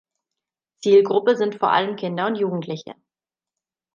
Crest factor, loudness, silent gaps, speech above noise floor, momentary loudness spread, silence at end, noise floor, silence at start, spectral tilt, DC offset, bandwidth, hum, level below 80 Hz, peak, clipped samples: 18 dB; -20 LUFS; none; 68 dB; 13 LU; 1.05 s; -88 dBFS; 0.8 s; -6 dB/octave; under 0.1%; 7.4 kHz; none; -76 dBFS; -4 dBFS; under 0.1%